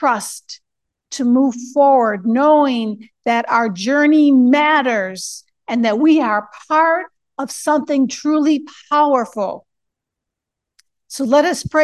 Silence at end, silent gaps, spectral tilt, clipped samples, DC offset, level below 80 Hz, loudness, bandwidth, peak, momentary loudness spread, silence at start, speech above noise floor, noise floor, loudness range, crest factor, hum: 0 s; none; -4 dB/octave; under 0.1%; under 0.1%; -58 dBFS; -16 LUFS; 12.5 kHz; -2 dBFS; 16 LU; 0 s; 67 dB; -82 dBFS; 5 LU; 14 dB; none